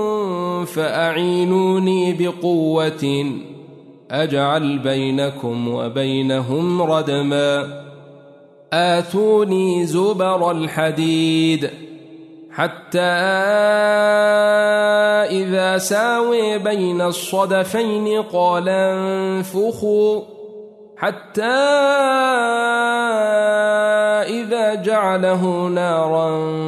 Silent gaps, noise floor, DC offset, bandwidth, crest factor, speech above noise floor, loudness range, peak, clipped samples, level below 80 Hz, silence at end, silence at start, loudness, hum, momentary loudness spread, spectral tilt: none; -45 dBFS; under 0.1%; 13.5 kHz; 14 dB; 28 dB; 4 LU; -4 dBFS; under 0.1%; -66 dBFS; 0 s; 0 s; -18 LUFS; none; 8 LU; -5 dB/octave